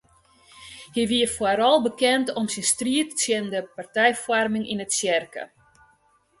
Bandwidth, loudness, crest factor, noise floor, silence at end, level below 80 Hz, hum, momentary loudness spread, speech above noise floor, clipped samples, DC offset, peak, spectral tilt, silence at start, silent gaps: 12 kHz; -23 LUFS; 20 dB; -63 dBFS; 0.95 s; -60 dBFS; none; 11 LU; 40 dB; under 0.1%; under 0.1%; -6 dBFS; -2.5 dB/octave; 0.55 s; none